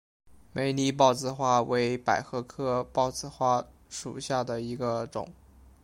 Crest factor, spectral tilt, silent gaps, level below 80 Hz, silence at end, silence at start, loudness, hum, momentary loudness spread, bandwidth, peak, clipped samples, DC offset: 22 dB; -5 dB/octave; none; -58 dBFS; 0.5 s; 0.55 s; -29 LUFS; none; 14 LU; 16.5 kHz; -8 dBFS; under 0.1%; under 0.1%